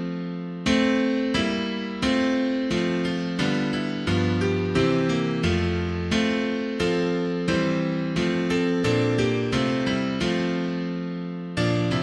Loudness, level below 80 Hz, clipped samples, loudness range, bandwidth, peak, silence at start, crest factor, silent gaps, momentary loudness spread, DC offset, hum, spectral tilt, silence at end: -24 LUFS; -46 dBFS; under 0.1%; 1 LU; 11 kHz; -8 dBFS; 0 s; 16 dB; none; 5 LU; under 0.1%; none; -6 dB/octave; 0 s